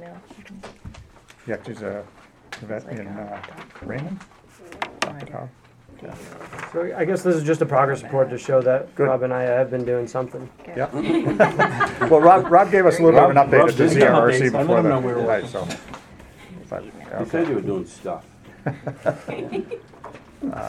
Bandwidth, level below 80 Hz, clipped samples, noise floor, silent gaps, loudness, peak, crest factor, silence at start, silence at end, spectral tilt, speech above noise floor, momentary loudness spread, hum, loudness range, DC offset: 13 kHz; -54 dBFS; under 0.1%; -47 dBFS; none; -19 LUFS; 0 dBFS; 20 dB; 0 s; 0 s; -6.5 dB/octave; 27 dB; 23 LU; none; 19 LU; under 0.1%